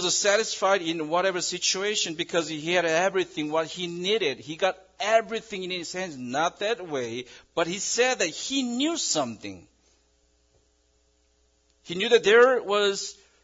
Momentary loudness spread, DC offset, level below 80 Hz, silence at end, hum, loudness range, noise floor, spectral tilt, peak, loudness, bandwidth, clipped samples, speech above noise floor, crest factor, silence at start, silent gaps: 11 LU; under 0.1%; -68 dBFS; 0.3 s; none; 6 LU; -67 dBFS; -2 dB/octave; -6 dBFS; -25 LUFS; 7.8 kHz; under 0.1%; 41 dB; 20 dB; 0 s; none